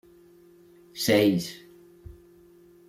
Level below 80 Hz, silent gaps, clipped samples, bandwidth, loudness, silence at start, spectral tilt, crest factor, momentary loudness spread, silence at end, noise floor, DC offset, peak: -60 dBFS; none; under 0.1%; 16.5 kHz; -24 LUFS; 0.95 s; -5 dB/octave; 22 dB; 24 LU; 0.75 s; -54 dBFS; under 0.1%; -8 dBFS